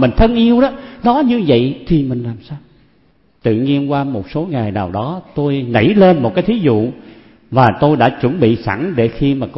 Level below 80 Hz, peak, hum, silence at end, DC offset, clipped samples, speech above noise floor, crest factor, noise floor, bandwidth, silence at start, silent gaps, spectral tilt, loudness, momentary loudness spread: -32 dBFS; 0 dBFS; none; 0 s; 0.1%; under 0.1%; 41 dB; 14 dB; -54 dBFS; 5.8 kHz; 0 s; none; -10.5 dB/octave; -14 LUFS; 10 LU